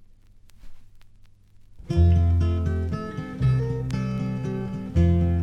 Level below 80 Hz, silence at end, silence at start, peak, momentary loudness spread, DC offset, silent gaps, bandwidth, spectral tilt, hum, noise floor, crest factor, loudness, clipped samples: -32 dBFS; 0 s; 0.55 s; -8 dBFS; 10 LU; under 0.1%; none; 6.4 kHz; -9 dB/octave; none; -50 dBFS; 16 dB; -24 LUFS; under 0.1%